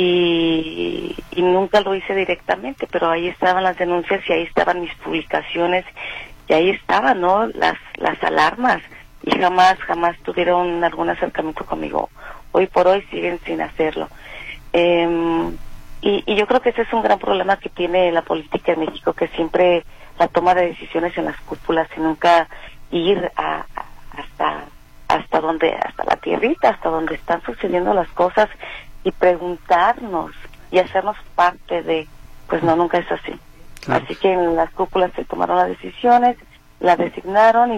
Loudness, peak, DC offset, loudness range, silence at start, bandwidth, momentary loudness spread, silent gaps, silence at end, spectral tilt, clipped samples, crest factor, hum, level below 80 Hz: -19 LUFS; -2 dBFS; under 0.1%; 3 LU; 0 s; 13 kHz; 11 LU; none; 0 s; -5.5 dB/octave; under 0.1%; 16 dB; none; -42 dBFS